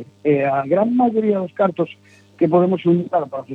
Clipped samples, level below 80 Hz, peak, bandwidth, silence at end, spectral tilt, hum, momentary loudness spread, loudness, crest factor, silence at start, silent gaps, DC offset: under 0.1%; -70 dBFS; -2 dBFS; 4.7 kHz; 0 s; -10 dB/octave; none; 6 LU; -18 LUFS; 16 dB; 0 s; none; under 0.1%